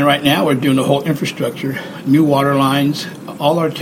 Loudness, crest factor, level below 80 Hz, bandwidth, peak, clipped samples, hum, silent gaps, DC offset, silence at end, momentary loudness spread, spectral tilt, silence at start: -15 LUFS; 14 dB; -54 dBFS; 16.5 kHz; 0 dBFS; under 0.1%; none; none; under 0.1%; 0 s; 10 LU; -6 dB/octave; 0 s